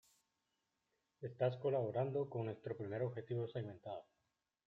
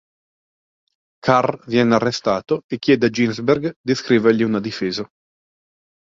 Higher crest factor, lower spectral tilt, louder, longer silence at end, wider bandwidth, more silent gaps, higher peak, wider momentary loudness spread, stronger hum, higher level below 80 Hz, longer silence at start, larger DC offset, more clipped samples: about the same, 18 dB vs 18 dB; first, -9 dB/octave vs -6 dB/octave; second, -42 LUFS vs -19 LUFS; second, 0.65 s vs 1.1 s; about the same, 7.8 kHz vs 7.6 kHz; second, none vs 2.64-2.69 s, 3.76-3.84 s; second, -24 dBFS vs -2 dBFS; first, 13 LU vs 8 LU; neither; second, -82 dBFS vs -56 dBFS; about the same, 1.2 s vs 1.25 s; neither; neither